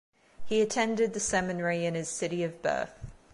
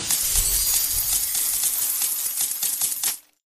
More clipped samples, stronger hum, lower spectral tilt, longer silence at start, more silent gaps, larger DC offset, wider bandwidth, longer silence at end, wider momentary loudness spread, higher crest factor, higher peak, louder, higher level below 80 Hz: neither; neither; first, -4 dB/octave vs 1 dB/octave; first, 0.4 s vs 0 s; neither; neither; second, 11.5 kHz vs 15.5 kHz; second, 0 s vs 0.3 s; about the same, 6 LU vs 4 LU; about the same, 16 dB vs 20 dB; second, -14 dBFS vs -4 dBFS; second, -30 LUFS vs -20 LUFS; second, -56 dBFS vs -40 dBFS